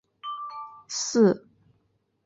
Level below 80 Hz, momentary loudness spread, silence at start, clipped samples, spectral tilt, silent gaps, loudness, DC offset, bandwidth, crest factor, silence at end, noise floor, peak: -70 dBFS; 17 LU; 0.25 s; under 0.1%; -4.5 dB/octave; none; -26 LUFS; under 0.1%; 8 kHz; 20 dB; 0.9 s; -71 dBFS; -8 dBFS